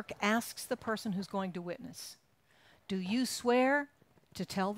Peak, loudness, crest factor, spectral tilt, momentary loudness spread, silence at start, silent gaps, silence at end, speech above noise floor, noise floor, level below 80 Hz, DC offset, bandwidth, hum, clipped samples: -16 dBFS; -34 LUFS; 18 dB; -4.5 dB/octave; 18 LU; 0 s; none; 0 s; 32 dB; -66 dBFS; -72 dBFS; under 0.1%; 16 kHz; none; under 0.1%